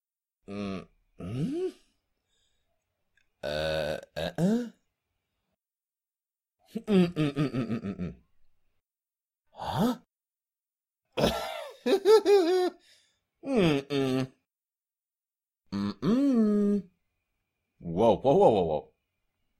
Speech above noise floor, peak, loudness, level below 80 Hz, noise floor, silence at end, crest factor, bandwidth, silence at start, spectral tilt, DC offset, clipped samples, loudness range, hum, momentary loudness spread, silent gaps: over 64 dB; -8 dBFS; -27 LUFS; -56 dBFS; under -90 dBFS; 0.75 s; 20 dB; 16 kHz; 0.5 s; -6.5 dB/octave; under 0.1%; under 0.1%; 10 LU; none; 18 LU; none